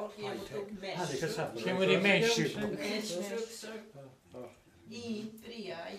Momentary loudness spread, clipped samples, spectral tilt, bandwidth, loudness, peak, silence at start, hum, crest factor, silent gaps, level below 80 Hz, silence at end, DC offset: 23 LU; under 0.1%; -4 dB/octave; 15.5 kHz; -33 LUFS; -12 dBFS; 0 s; none; 24 dB; none; -70 dBFS; 0 s; under 0.1%